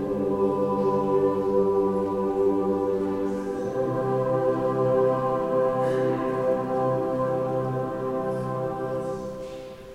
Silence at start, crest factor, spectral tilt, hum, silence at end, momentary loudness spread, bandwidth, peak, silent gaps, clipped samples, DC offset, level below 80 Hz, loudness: 0 s; 14 dB; -8.5 dB/octave; none; 0 s; 6 LU; 11 kHz; -12 dBFS; none; under 0.1%; under 0.1%; -54 dBFS; -25 LUFS